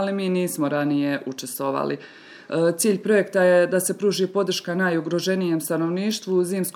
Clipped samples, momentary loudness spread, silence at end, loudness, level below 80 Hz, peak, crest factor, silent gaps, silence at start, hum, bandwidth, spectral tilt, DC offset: under 0.1%; 9 LU; 0.05 s; -22 LUFS; -78 dBFS; -8 dBFS; 16 dB; none; 0 s; none; 20 kHz; -4.5 dB/octave; under 0.1%